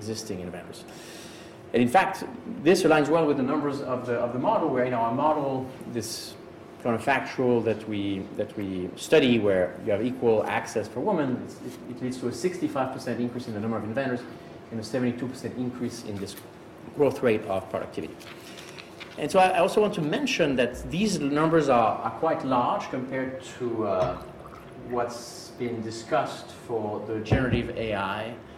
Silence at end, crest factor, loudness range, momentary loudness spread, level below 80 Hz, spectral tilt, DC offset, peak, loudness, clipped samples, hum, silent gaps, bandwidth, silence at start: 0 s; 18 dB; 7 LU; 18 LU; -52 dBFS; -5.5 dB/octave; under 0.1%; -10 dBFS; -27 LUFS; under 0.1%; none; none; 16 kHz; 0 s